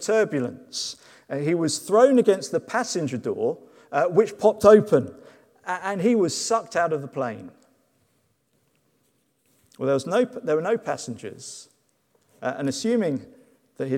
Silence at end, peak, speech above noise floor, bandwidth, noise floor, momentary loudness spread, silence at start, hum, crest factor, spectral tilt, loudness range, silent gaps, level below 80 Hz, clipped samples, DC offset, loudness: 0 s; -2 dBFS; 46 dB; 15 kHz; -68 dBFS; 17 LU; 0 s; none; 22 dB; -5 dB/octave; 9 LU; none; -64 dBFS; under 0.1%; under 0.1%; -23 LUFS